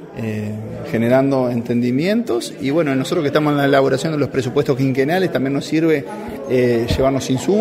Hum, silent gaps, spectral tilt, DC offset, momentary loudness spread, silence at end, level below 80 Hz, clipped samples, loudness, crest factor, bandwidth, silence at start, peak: none; none; -6.5 dB/octave; under 0.1%; 9 LU; 0 s; -44 dBFS; under 0.1%; -18 LUFS; 16 dB; 16 kHz; 0 s; -2 dBFS